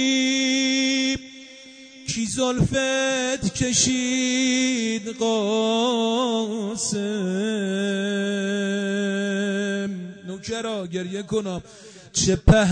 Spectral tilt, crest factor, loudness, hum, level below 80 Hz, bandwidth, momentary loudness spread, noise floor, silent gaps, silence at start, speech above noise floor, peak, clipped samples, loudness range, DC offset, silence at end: -4 dB/octave; 16 dB; -23 LUFS; none; -38 dBFS; 9.6 kHz; 11 LU; -44 dBFS; none; 0 s; 22 dB; -6 dBFS; under 0.1%; 5 LU; under 0.1%; 0 s